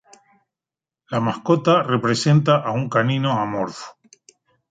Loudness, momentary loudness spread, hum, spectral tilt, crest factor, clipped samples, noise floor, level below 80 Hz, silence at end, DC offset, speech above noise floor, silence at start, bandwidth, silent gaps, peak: -19 LUFS; 11 LU; none; -6 dB/octave; 18 dB; under 0.1%; -90 dBFS; -62 dBFS; 0.8 s; under 0.1%; 71 dB; 1.1 s; 9.2 kHz; none; -2 dBFS